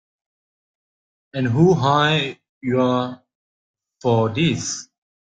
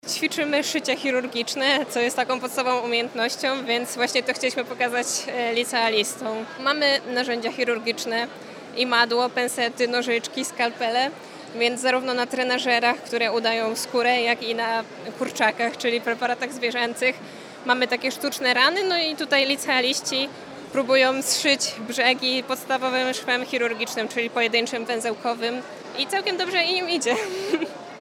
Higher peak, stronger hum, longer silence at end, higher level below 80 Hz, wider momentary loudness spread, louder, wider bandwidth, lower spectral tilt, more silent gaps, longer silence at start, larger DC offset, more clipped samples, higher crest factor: about the same, -4 dBFS vs -4 dBFS; neither; first, 0.5 s vs 0 s; first, -56 dBFS vs -78 dBFS; first, 14 LU vs 7 LU; first, -19 LUFS vs -23 LUFS; second, 9.2 kHz vs 17.5 kHz; first, -5.5 dB/octave vs -1.5 dB/octave; first, 2.49-2.61 s, 3.35-3.74 s vs none; first, 1.35 s vs 0.05 s; neither; neither; about the same, 18 dB vs 20 dB